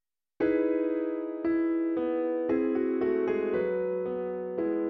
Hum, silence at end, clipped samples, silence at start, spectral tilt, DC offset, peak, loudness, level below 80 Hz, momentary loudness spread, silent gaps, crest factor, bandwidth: none; 0 s; under 0.1%; 0.4 s; -6.5 dB/octave; under 0.1%; -16 dBFS; -29 LUFS; -64 dBFS; 5 LU; none; 14 dB; 4.3 kHz